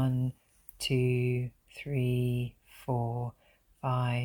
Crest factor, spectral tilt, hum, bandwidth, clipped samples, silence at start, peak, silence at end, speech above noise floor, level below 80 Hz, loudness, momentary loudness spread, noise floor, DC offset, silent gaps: 14 dB; -7 dB/octave; none; 18.5 kHz; under 0.1%; 0 s; -16 dBFS; 0 s; 24 dB; -58 dBFS; -32 LUFS; 12 LU; -54 dBFS; under 0.1%; none